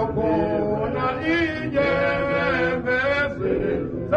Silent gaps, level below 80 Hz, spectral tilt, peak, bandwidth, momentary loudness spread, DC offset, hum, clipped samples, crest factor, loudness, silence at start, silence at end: none; -42 dBFS; -7.5 dB/octave; -8 dBFS; 8.4 kHz; 3 LU; under 0.1%; none; under 0.1%; 14 dB; -22 LUFS; 0 s; 0 s